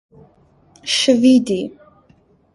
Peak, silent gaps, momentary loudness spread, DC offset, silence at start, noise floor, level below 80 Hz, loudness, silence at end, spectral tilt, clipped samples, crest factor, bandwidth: -2 dBFS; none; 18 LU; under 0.1%; 0.85 s; -54 dBFS; -58 dBFS; -15 LUFS; 0.85 s; -3.5 dB/octave; under 0.1%; 18 dB; 11.5 kHz